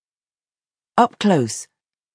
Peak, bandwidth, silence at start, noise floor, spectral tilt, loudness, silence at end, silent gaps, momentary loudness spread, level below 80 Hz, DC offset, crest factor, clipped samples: -2 dBFS; 10.5 kHz; 1 s; under -90 dBFS; -5 dB/octave; -19 LUFS; 0.5 s; none; 10 LU; -68 dBFS; under 0.1%; 20 dB; under 0.1%